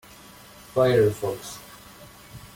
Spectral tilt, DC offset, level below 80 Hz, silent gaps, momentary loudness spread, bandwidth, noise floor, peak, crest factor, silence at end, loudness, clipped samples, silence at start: -6 dB/octave; under 0.1%; -56 dBFS; none; 26 LU; 17 kHz; -48 dBFS; -8 dBFS; 18 dB; 0.1 s; -23 LUFS; under 0.1%; 0.75 s